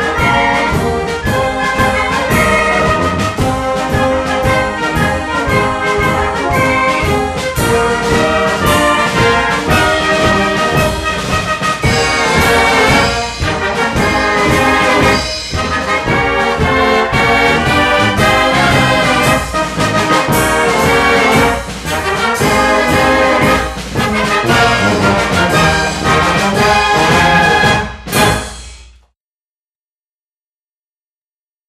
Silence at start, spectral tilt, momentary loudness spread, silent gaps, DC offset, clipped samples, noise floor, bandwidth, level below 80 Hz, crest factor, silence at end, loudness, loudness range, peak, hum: 0 s; -4 dB/octave; 6 LU; none; under 0.1%; under 0.1%; under -90 dBFS; 14 kHz; -28 dBFS; 12 dB; 2.85 s; -11 LUFS; 3 LU; 0 dBFS; none